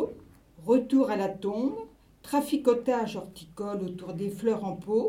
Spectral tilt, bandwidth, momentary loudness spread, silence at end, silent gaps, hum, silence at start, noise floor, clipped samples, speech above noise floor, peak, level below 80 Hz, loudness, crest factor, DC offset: -6.5 dB/octave; 16 kHz; 14 LU; 0 s; none; none; 0 s; -52 dBFS; under 0.1%; 24 dB; -12 dBFS; -62 dBFS; -29 LUFS; 18 dB; under 0.1%